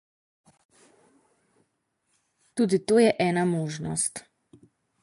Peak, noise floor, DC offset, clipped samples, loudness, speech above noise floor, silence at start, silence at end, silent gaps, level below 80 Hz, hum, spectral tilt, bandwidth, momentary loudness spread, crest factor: -8 dBFS; -76 dBFS; under 0.1%; under 0.1%; -25 LUFS; 52 dB; 2.55 s; 0.85 s; none; -66 dBFS; none; -5 dB/octave; 11.5 kHz; 10 LU; 20 dB